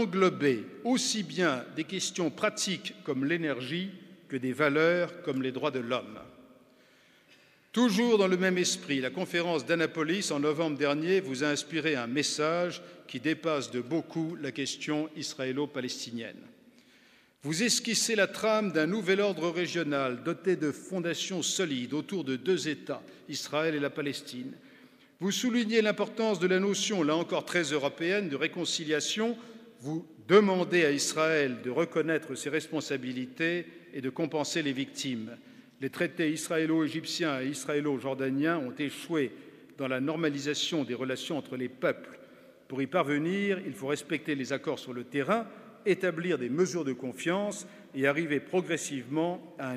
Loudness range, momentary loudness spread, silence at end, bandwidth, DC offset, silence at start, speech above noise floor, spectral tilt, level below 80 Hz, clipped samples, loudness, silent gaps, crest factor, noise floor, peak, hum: 5 LU; 10 LU; 0 s; 15.5 kHz; under 0.1%; 0 s; 31 dB; -4 dB/octave; -82 dBFS; under 0.1%; -30 LUFS; none; 24 dB; -61 dBFS; -6 dBFS; none